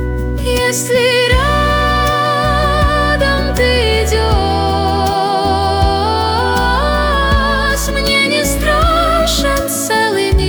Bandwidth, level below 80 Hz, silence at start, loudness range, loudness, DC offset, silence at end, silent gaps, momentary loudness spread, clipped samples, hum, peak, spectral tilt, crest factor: over 20 kHz; -20 dBFS; 0 s; 1 LU; -13 LUFS; under 0.1%; 0 s; none; 3 LU; under 0.1%; none; -2 dBFS; -4 dB/octave; 12 dB